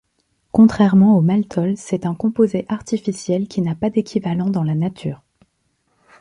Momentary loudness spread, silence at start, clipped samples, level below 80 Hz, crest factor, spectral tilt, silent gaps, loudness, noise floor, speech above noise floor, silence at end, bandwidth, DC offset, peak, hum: 11 LU; 0.55 s; under 0.1%; -52 dBFS; 16 dB; -8 dB/octave; none; -18 LUFS; -67 dBFS; 50 dB; 1.05 s; 10.5 kHz; under 0.1%; -2 dBFS; none